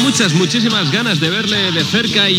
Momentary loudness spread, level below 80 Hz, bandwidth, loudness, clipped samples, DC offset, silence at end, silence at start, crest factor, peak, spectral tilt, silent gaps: 2 LU; -54 dBFS; 17.5 kHz; -13 LUFS; under 0.1%; under 0.1%; 0 s; 0 s; 14 dB; 0 dBFS; -3.5 dB/octave; none